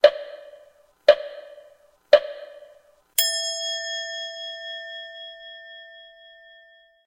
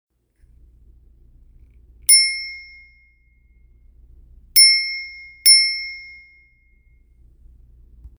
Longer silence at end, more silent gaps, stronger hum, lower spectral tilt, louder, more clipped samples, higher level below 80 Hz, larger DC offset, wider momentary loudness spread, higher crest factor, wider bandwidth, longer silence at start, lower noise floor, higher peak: second, 1.05 s vs 2.15 s; neither; neither; first, 1.5 dB/octave vs 4.5 dB/octave; second, -23 LUFS vs -13 LUFS; neither; second, -68 dBFS vs -50 dBFS; neither; about the same, 23 LU vs 23 LU; about the same, 24 dB vs 22 dB; second, 16 kHz vs over 20 kHz; second, 0.05 s vs 2.1 s; about the same, -55 dBFS vs -56 dBFS; about the same, 0 dBFS vs 0 dBFS